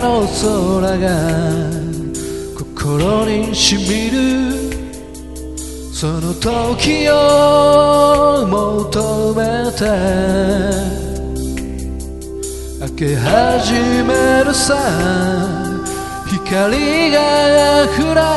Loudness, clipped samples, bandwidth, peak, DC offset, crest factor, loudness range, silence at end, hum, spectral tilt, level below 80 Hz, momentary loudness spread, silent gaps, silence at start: -14 LUFS; under 0.1%; 12 kHz; 0 dBFS; 0.6%; 14 dB; 6 LU; 0 s; none; -4.5 dB/octave; -30 dBFS; 15 LU; none; 0 s